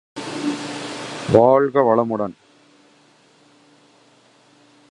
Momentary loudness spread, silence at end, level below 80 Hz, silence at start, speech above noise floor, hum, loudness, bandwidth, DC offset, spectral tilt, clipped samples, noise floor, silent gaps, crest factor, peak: 16 LU; 2.6 s; -54 dBFS; 0.15 s; 39 dB; none; -19 LUFS; 11.5 kHz; under 0.1%; -6 dB/octave; under 0.1%; -54 dBFS; none; 22 dB; 0 dBFS